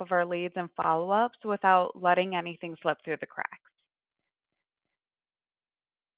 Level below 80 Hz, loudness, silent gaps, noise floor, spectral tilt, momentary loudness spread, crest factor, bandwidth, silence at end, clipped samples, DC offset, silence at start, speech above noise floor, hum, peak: -80 dBFS; -29 LUFS; none; under -90 dBFS; -3 dB/octave; 12 LU; 22 dB; 4 kHz; 2.6 s; under 0.1%; under 0.1%; 0 s; over 62 dB; none; -8 dBFS